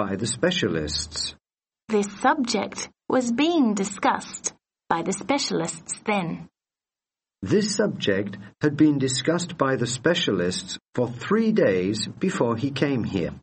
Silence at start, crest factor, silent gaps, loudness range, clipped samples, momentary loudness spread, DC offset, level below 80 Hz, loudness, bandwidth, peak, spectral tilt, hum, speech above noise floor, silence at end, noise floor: 0 s; 20 dB; 10.89-10.93 s; 4 LU; under 0.1%; 10 LU; under 0.1%; -54 dBFS; -24 LUFS; 8.8 kHz; -6 dBFS; -4.5 dB/octave; none; over 66 dB; 0.05 s; under -90 dBFS